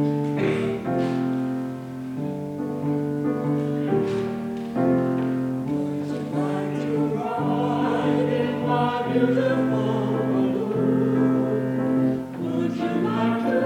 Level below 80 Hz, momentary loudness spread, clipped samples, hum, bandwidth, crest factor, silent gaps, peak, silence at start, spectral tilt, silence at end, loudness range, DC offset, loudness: -60 dBFS; 7 LU; under 0.1%; none; 11 kHz; 14 dB; none; -8 dBFS; 0 s; -8 dB/octave; 0 s; 4 LU; under 0.1%; -24 LUFS